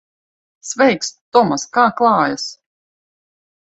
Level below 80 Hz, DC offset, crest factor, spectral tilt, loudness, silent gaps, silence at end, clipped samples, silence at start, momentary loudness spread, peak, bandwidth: -62 dBFS; under 0.1%; 18 dB; -3.5 dB/octave; -16 LUFS; 1.21-1.32 s; 1.25 s; under 0.1%; 0.65 s; 14 LU; 0 dBFS; 8.2 kHz